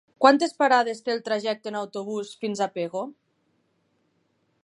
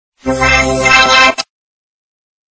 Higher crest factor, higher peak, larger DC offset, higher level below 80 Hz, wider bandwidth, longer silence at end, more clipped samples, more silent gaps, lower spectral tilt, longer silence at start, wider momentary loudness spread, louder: first, 24 dB vs 12 dB; about the same, -2 dBFS vs 0 dBFS; neither; second, -82 dBFS vs -30 dBFS; first, 11.5 kHz vs 8 kHz; first, 1.5 s vs 1.15 s; second, under 0.1% vs 0.3%; neither; first, -4 dB/octave vs -2.5 dB/octave; about the same, 0.2 s vs 0.25 s; about the same, 13 LU vs 15 LU; second, -25 LUFS vs -8 LUFS